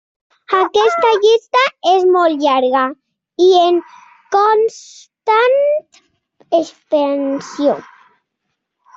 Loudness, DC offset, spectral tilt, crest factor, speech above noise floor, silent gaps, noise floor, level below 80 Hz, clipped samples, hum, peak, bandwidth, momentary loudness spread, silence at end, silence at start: -14 LUFS; under 0.1%; -3 dB/octave; 14 dB; 60 dB; none; -74 dBFS; -66 dBFS; under 0.1%; none; -2 dBFS; 7.8 kHz; 8 LU; 1.15 s; 0.5 s